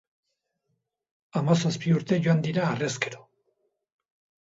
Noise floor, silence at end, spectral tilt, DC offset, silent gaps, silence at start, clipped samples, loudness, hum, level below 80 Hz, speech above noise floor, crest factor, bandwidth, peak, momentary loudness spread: -78 dBFS; 1.2 s; -6 dB/octave; under 0.1%; none; 1.35 s; under 0.1%; -26 LUFS; none; -68 dBFS; 54 dB; 20 dB; 8 kHz; -8 dBFS; 8 LU